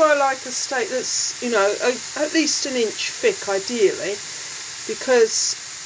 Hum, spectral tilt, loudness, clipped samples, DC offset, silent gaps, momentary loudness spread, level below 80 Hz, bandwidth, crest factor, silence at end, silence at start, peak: none; -1 dB/octave; -21 LUFS; under 0.1%; under 0.1%; none; 10 LU; -66 dBFS; 8 kHz; 16 dB; 0 s; 0 s; -4 dBFS